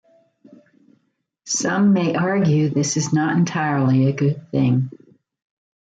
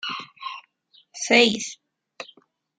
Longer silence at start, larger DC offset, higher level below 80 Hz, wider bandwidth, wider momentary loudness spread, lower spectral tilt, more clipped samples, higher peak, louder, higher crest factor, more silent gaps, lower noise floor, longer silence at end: first, 1.45 s vs 0.05 s; neither; first, -62 dBFS vs -70 dBFS; about the same, 9.4 kHz vs 9.6 kHz; second, 5 LU vs 24 LU; first, -5.5 dB/octave vs -2 dB/octave; neither; second, -8 dBFS vs -2 dBFS; about the same, -19 LUFS vs -21 LUFS; second, 12 dB vs 24 dB; neither; first, -69 dBFS vs -60 dBFS; first, 0.95 s vs 0.55 s